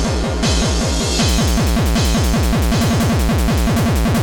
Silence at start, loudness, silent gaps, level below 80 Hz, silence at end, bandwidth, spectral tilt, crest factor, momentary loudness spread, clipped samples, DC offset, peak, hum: 0 s; -16 LUFS; none; -20 dBFS; 0 s; over 20 kHz; -5 dB/octave; 10 dB; 2 LU; under 0.1%; under 0.1%; -6 dBFS; none